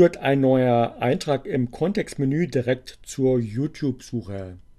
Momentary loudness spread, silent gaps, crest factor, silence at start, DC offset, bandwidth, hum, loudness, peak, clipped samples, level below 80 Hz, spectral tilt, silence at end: 13 LU; none; 18 dB; 0 s; under 0.1%; 13 kHz; none; -23 LUFS; -4 dBFS; under 0.1%; -52 dBFS; -7 dB/octave; 0.2 s